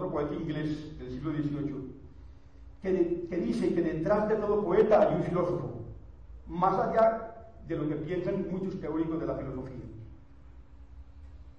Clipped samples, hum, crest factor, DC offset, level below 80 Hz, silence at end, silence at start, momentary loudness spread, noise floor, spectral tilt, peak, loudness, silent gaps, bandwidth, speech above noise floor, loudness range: under 0.1%; none; 18 dB; 0.2%; -50 dBFS; 0.05 s; 0 s; 19 LU; -52 dBFS; -8.5 dB/octave; -12 dBFS; -30 LUFS; none; 9.6 kHz; 23 dB; 7 LU